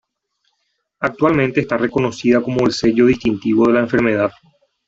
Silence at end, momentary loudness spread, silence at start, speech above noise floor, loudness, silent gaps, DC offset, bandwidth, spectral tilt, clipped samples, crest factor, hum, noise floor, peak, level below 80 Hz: 0.55 s; 5 LU; 1 s; 54 dB; -16 LUFS; none; under 0.1%; 8 kHz; -6.5 dB/octave; under 0.1%; 14 dB; none; -70 dBFS; -2 dBFS; -48 dBFS